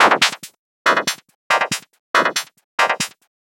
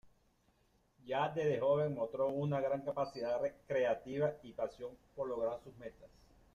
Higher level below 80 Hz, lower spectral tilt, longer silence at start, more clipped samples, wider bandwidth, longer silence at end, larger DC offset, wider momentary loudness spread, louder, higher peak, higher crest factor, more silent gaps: about the same, -70 dBFS vs -70 dBFS; second, -1 dB/octave vs -7.5 dB/octave; about the same, 0 s vs 0.05 s; neither; first, over 20 kHz vs 7.4 kHz; second, 0.35 s vs 0.5 s; neither; second, 10 LU vs 13 LU; first, -19 LUFS vs -37 LUFS; first, 0 dBFS vs -22 dBFS; about the same, 18 dB vs 16 dB; first, 0.59-0.85 s, 1.35-1.50 s, 1.99-2.14 s, 2.64-2.78 s vs none